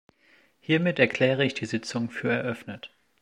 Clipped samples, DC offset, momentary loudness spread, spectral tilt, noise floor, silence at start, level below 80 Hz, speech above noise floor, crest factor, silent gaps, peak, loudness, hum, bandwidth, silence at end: under 0.1%; under 0.1%; 19 LU; -5.5 dB/octave; -62 dBFS; 0.7 s; -70 dBFS; 36 dB; 22 dB; none; -6 dBFS; -26 LUFS; none; 11.5 kHz; 0.35 s